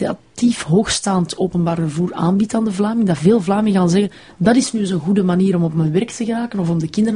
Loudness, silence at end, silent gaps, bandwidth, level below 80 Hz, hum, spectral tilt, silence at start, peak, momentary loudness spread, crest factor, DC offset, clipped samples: -17 LUFS; 0 s; none; 10.5 kHz; -48 dBFS; none; -6 dB/octave; 0 s; -2 dBFS; 5 LU; 14 dB; 0.1%; under 0.1%